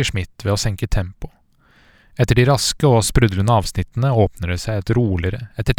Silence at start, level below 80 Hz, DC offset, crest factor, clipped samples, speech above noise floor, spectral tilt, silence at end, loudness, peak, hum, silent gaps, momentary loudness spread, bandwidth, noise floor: 0 s; -30 dBFS; under 0.1%; 18 dB; under 0.1%; 37 dB; -5.5 dB/octave; 0.05 s; -18 LUFS; 0 dBFS; none; none; 10 LU; 17.5 kHz; -54 dBFS